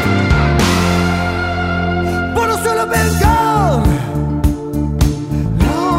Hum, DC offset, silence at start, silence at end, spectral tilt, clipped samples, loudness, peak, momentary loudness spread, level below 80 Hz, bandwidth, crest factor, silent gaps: none; under 0.1%; 0 s; 0 s; -6 dB/octave; under 0.1%; -15 LUFS; 0 dBFS; 5 LU; -22 dBFS; 16.5 kHz; 14 dB; none